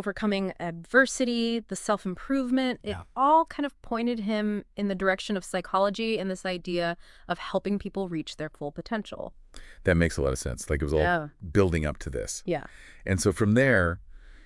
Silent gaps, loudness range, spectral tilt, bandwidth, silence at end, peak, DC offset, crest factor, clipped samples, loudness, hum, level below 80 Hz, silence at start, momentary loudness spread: none; 5 LU; -5.5 dB/octave; 12 kHz; 0.05 s; -8 dBFS; under 0.1%; 20 dB; under 0.1%; -27 LUFS; none; -44 dBFS; 0 s; 12 LU